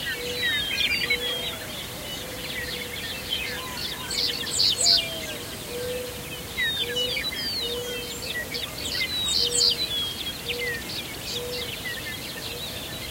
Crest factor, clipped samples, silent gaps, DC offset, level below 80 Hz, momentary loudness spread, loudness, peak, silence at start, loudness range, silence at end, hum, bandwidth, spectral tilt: 22 dB; under 0.1%; none; under 0.1%; -48 dBFS; 12 LU; -26 LUFS; -6 dBFS; 0 s; 5 LU; 0 s; none; 16 kHz; -1 dB/octave